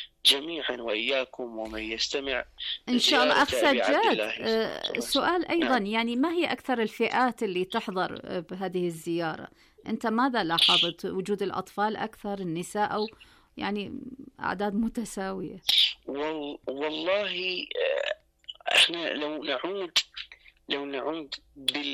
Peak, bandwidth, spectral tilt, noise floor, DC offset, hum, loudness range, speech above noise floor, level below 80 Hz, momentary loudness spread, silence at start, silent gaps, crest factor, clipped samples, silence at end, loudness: -10 dBFS; 15.5 kHz; -3 dB/octave; -48 dBFS; under 0.1%; none; 6 LU; 20 dB; -60 dBFS; 14 LU; 0 s; none; 18 dB; under 0.1%; 0 s; -27 LUFS